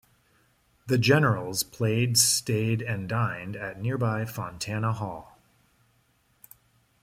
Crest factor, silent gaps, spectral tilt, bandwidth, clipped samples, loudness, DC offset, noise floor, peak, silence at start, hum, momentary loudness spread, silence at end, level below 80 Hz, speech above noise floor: 20 dB; none; -4 dB/octave; 16 kHz; under 0.1%; -26 LUFS; under 0.1%; -67 dBFS; -8 dBFS; 0.85 s; none; 14 LU; 1.8 s; -60 dBFS; 41 dB